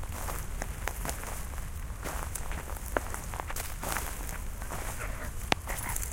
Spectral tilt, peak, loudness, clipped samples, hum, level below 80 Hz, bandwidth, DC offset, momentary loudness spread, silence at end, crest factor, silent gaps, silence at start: -3.5 dB/octave; -2 dBFS; -36 LUFS; under 0.1%; none; -38 dBFS; 17 kHz; under 0.1%; 7 LU; 0 s; 32 dB; none; 0 s